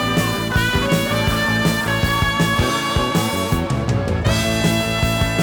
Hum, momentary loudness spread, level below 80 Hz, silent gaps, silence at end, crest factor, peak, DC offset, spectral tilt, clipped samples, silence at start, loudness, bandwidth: none; 3 LU; -30 dBFS; none; 0 s; 14 dB; -4 dBFS; under 0.1%; -4.5 dB/octave; under 0.1%; 0 s; -18 LUFS; over 20 kHz